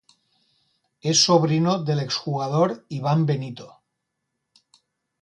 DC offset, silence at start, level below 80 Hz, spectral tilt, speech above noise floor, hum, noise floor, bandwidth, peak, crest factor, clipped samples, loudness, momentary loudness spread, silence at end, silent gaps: under 0.1%; 1.05 s; -66 dBFS; -5 dB/octave; 57 dB; none; -79 dBFS; 10.5 kHz; -4 dBFS; 20 dB; under 0.1%; -21 LUFS; 12 LU; 1.55 s; none